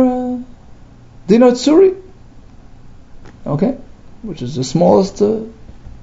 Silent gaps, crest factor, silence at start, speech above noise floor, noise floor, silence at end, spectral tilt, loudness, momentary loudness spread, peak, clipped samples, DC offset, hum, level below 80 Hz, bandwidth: none; 16 dB; 0 s; 26 dB; -39 dBFS; 0.1 s; -6.5 dB/octave; -14 LUFS; 21 LU; 0 dBFS; under 0.1%; under 0.1%; 60 Hz at -40 dBFS; -40 dBFS; 7.8 kHz